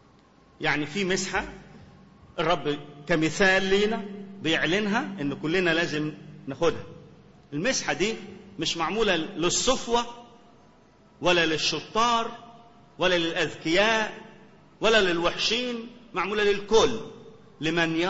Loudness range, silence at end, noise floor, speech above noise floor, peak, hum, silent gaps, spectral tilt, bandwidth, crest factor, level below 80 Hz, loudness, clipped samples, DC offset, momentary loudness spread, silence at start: 3 LU; 0 s; -57 dBFS; 32 dB; -6 dBFS; none; none; -3.5 dB/octave; 8 kHz; 20 dB; -50 dBFS; -25 LUFS; under 0.1%; under 0.1%; 15 LU; 0.6 s